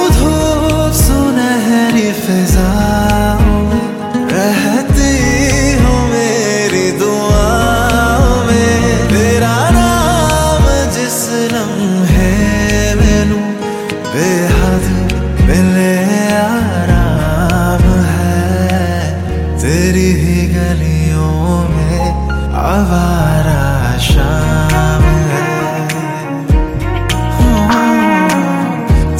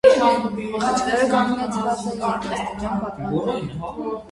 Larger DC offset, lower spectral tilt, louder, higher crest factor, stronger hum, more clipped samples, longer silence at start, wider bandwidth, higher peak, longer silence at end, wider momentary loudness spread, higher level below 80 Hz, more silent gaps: neither; about the same, -5.5 dB/octave vs -5 dB/octave; first, -12 LUFS vs -22 LUFS; second, 10 dB vs 20 dB; neither; neither; about the same, 0 s vs 0.05 s; first, 16.5 kHz vs 11.5 kHz; about the same, 0 dBFS vs 0 dBFS; about the same, 0 s vs 0 s; second, 5 LU vs 9 LU; first, -18 dBFS vs -48 dBFS; neither